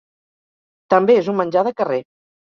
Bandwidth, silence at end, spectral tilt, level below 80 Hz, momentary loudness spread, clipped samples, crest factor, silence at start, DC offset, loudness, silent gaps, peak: 6.8 kHz; 0.4 s; -7.5 dB/octave; -66 dBFS; 8 LU; under 0.1%; 18 dB; 0.9 s; under 0.1%; -17 LUFS; none; -2 dBFS